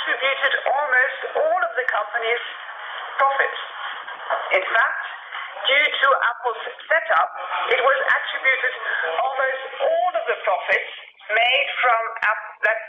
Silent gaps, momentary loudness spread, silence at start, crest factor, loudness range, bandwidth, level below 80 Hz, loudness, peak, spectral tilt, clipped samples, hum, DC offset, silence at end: none; 13 LU; 0 s; 16 dB; 3 LU; 7.2 kHz; -78 dBFS; -20 LUFS; -6 dBFS; -1.5 dB/octave; under 0.1%; none; under 0.1%; 0 s